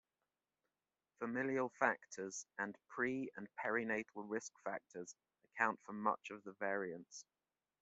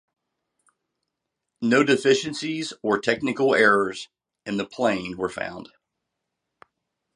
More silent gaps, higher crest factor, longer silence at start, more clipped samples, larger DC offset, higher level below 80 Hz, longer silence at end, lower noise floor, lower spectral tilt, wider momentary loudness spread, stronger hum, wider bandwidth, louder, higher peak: neither; about the same, 26 dB vs 22 dB; second, 1.2 s vs 1.6 s; neither; neither; second, -86 dBFS vs -64 dBFS; second, 0.6 s vs 1.5 s; first, under -90 dBFS vs -82 dBFS; about the same, -4 dB/octave vs -4.5 dB/octave; about the same, 14 LU vs 15 LU; neither; second, 8 kHz vs 11 kHz; second, -42 LUFS vs -23 LUFS; second, -18 dBFS vs -4 dBFS